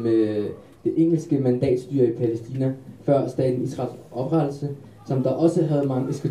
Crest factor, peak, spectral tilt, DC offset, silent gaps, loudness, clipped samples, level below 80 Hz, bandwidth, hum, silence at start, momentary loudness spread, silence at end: 16 dB; -6 dBFS; -9 dB/octave; 0.1%; none; -23 LUFS; under 0.1%; -60 dBFS; 11 kHz; none; 0 s; 10 LU; 0 s